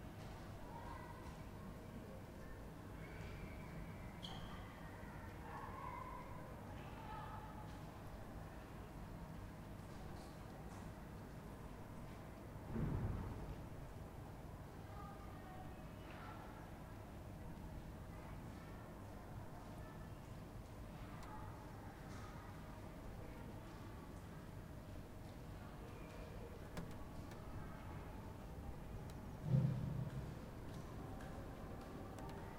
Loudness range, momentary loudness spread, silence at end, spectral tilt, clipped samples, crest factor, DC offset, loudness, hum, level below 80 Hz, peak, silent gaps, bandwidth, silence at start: 8 LU; 5 LU; 0 s; -7 dB/octave; under 0.1%; 26 dB; under 0.1%; -52 LUFS; 50 Hz at -65 dBFS; -58 dBFS; -24 dBFS; none; 16 kHz; 0 s